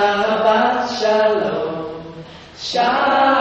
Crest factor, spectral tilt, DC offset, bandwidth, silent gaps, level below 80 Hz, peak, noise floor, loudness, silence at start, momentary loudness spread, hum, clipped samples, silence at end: 14 dB; -4 dB/octave; under 0.1%; 8.2 kHz; none; -54 dBFS; -4 dBFS; -37 dBFS; -17 LUFS; 0 s; 18 LU; none; under 0.1%; 0 s